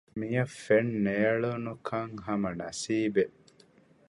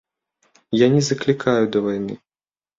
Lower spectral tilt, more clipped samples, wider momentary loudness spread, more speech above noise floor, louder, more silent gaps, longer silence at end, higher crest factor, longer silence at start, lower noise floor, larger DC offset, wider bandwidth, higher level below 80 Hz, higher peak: about the same, -6 dB/octave vs -6 dB/octave; neither; second, 8 LU vs 12 LU; second, 31 dB vs over 72 dB; second, -30 LUFS vs -19 LUFS; neither; first, 0.8 s vs 0.65 s; about the same, 18 dB vs 18 dB; second, 0.15 s vs 0.7 s; second, -61 dBFS vs under -90 dBFS; neither; first, 11.5 kHz vs 7.8 kHz; second, -64 dBFS vs -58 dBFS; second, -12 dBFS vs -2 dBFS